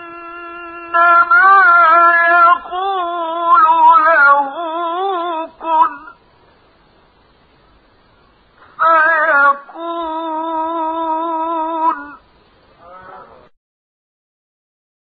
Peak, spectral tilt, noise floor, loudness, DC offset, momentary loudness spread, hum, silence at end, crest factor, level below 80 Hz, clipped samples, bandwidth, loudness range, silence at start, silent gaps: -2 dBFS; 1 dB/octave; -51 dBFS; -12 LUFS; under 0.1%; 15 LU; none; 1.8 s; 14 dB; -60 dBFS; under 0.1%; 4.8 kHz; 13 LU; 0 s; none